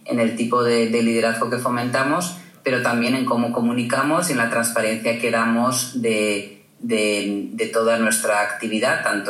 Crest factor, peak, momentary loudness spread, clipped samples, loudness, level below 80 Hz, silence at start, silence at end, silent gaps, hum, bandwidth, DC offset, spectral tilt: 14 dB; -6 dBFS; 5 LU; under 0.1%; -20 LUFS; -82 dBFS; 0.05 s; 0 s; none; none; 15 kHz; under 0.1%; -4 dB/octave